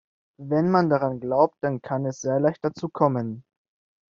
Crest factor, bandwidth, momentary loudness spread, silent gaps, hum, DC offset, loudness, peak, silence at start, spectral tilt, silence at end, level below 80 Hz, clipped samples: 20 dB; 7.4 kHz; 9 LU; none; none; under 0.1%; -24 LUFS; -4 dBFS; 0.4 s; -7.5 dB/octave; 0.7 s; -66 dBFS; under 0.1%